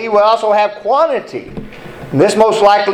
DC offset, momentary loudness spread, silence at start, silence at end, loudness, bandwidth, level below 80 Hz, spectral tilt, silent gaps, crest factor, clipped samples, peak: under 0.1%; 20 LU; 0 s; 0 s; -12 LUFS; 12 kHz; -44 dBFS; -5 dB/octave; none; 12 dB; under 0.1%; 0 dBFS